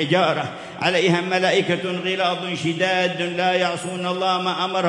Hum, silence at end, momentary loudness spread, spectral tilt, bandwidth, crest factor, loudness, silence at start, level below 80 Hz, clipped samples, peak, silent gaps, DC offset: none; 0 s; 5 LU; -4.5 dB/octave; 11.5 kHz; 16 dB; -21 LUFS; 0 s; -70 dBFS; under 0.1%; -6 dBFS; none; under 0.1%